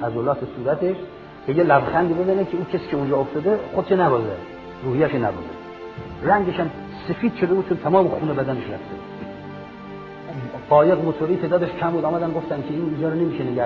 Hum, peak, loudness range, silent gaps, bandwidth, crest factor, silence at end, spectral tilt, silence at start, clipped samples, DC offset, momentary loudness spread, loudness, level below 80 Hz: none; -2 dBFS; 3 LU; none; 6 kHz; 20 dB; 0 s; -9.5 dB/octave; 0 s; under 0.1%; under 0.1%; 17 LU; -21 LUFS; -52 dBFS